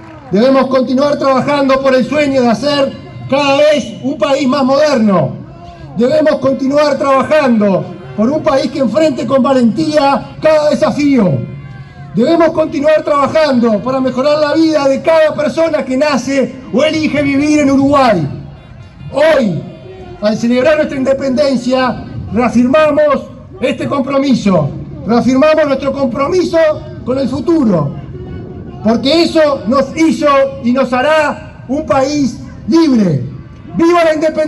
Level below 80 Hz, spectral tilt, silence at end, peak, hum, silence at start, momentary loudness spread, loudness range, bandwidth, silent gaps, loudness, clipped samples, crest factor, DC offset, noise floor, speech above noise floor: -42 dBFS; -6 dB/octave; 0 s; 0 dBFS; none; 0 s; 11 LU; 2 LU; 11.5 kHz; none; -12 LUFS; under 0.1%; 12 dB; under 0.1%; -33 dBFS; 22 dB